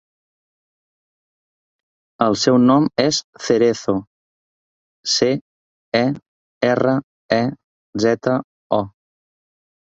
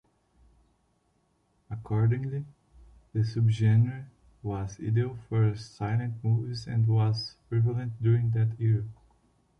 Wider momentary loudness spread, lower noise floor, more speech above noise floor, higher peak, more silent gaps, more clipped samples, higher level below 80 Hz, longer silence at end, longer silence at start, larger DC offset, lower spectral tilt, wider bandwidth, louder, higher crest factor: about the same, 10 LU vs 11 LU; first, under -90 dBFS vs -71 dBFS; first, over 73 dB vs 44 dB; first, -2 dBFS vs -14 dBFS; first, 3.24-3.33 s, 4.07-5.03 s, 5.41-5.92 s, 6.28-6.61 s, 7.03-7.29 s, 7.64-7.93 s, 8.44-8.70 s vs none; neither; about the same, -58 dBFS vs -56 dBFS; first, 0.9 s vs 0.65 s; first, 2.2 s vs 1.7 s; neither; second, -4.5 dB/octave vs -8 dB/octave; first, 8 kHz vs 6.6 kHz; first, -19 LUFS vs -28 LUFS; first, 20 dB vs 14 dB